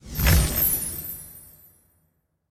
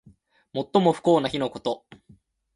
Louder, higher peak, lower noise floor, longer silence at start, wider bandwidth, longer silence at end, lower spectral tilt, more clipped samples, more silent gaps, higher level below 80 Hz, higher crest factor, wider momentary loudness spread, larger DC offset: about the same, -22 LUFS vs -24 LUFS; about the same, -6 dBFS vs -6 dBFS; first, -70 dBFS vs -57 dBFS; second, 0.05 s vs 0.55 s; first, 19.5 kHz vs 11.5 kHz; first, 1.1 s vs 0.8 s; second, -4 dB/octave vs -6.5 dB/octave; neither; neither; first, -30 dBFS vs -62 dBFS; about the same, 20 dB vs 20 dB; first, 21 LU vs 13 LU; neither